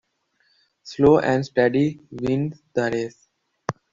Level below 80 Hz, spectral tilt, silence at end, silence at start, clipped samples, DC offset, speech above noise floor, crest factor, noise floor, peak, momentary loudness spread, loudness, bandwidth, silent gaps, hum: -52 dBFS; -7 dB/octave; 0.2 s; 0.85 s; under 0.1%; under 0.1%; 47 dB; 20 dB; -67 dBFS; -4 dBFS; 16 LU; -22 LUFS; 7.6 kHz; none; none